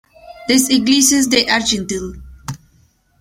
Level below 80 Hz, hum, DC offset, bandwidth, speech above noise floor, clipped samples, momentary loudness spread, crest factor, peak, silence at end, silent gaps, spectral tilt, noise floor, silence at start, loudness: -42 dBFS; none; under 0.1%; 16.5 kHz; 41 dB; under 0.1%; 20 LU; 18 dB; 0 dBFS; 0.65 s; none; -2 dB/octave; -55 dBFS; 0.25 s; -14 LUFS